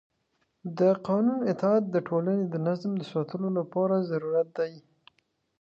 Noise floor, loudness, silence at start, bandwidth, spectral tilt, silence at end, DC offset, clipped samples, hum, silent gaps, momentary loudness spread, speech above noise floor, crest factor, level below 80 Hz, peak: -74 dBFS; -28 LUFS; 0.65 s; 7.2 kHz; -9 dB/octave; 0.8 s; under 0.1%; under 0.1%; none; none; 7 LU; 48 dB; 16 dB; -76 dBFS; -12 dBFS